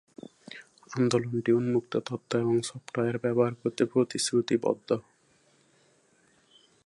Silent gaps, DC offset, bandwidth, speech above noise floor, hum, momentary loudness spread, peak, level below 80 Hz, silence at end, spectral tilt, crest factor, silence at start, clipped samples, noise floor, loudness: none; under 0.1%; 11.5 kHz; 38 dB; none; 19 LU; -8 dBFS; -72 dBFS; 1.85 s; -5.5 dB/octave; 20 dB; 0.5 s; under 0.1%; -65 dBFS; -28 LUFS